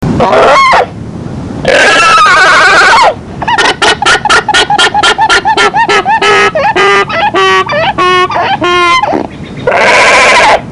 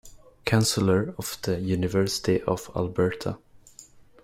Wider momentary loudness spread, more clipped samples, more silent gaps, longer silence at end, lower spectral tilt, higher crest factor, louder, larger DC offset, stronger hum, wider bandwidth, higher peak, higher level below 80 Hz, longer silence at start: about the same, 10 LU vs 11 LU; neither; neither; second, 0 s vs 0.25 s; second, -2.5 dB/octave vs -5 dB/octave; second, 6 dB vs 20 dB; first, -5 LUFS vs -26 LUFS; first, 0.3% vs under 0.1%; neither; second, 11.5 kHz vs 16 kHz; first, 0 dBFS vs -6 dBFS; first, -34 dBFS vs -52 dBFS; about the same, 0 s vs 0.05 s